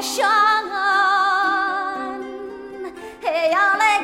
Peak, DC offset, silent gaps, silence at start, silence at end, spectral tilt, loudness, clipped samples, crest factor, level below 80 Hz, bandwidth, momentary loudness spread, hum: -6 dBFS; under 0.1%; none; 0 s; 0 s; -0.5 dB/octave; -18 LUFS; under 0.1%; 14 dB; -60 dBFS; 16.5 kHz; 17 LU; none